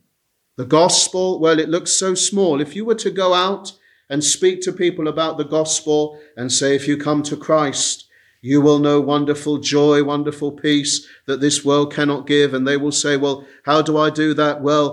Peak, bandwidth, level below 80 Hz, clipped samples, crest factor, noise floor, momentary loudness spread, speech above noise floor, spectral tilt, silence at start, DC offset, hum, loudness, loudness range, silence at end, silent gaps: -2 dBFS; 12 kHz; -66 dBFS; under 0.1%; 16 dB; -69 dBFS; 7 LU; 52 dB; -3.5 dB/octave; 0.6 s; under 0.1%; none; -17 LUFS; 2 LU; 0 s; none